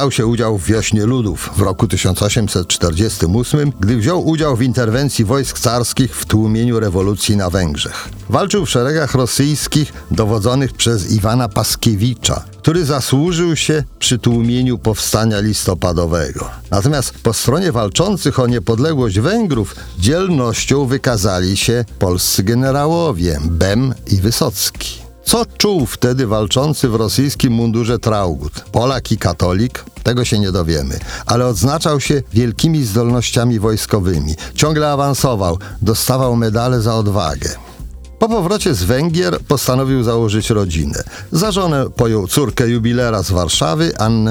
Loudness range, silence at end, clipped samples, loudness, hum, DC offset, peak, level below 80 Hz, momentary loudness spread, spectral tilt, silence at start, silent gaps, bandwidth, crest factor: 1 LU; 0 s; under 0.1%; -15 LUFS; none; under 0.1%; 0 dBFS; -30 dBFS; 4 LU; -5 dB/octave; 0 s; none; 20 kHz; 14 dB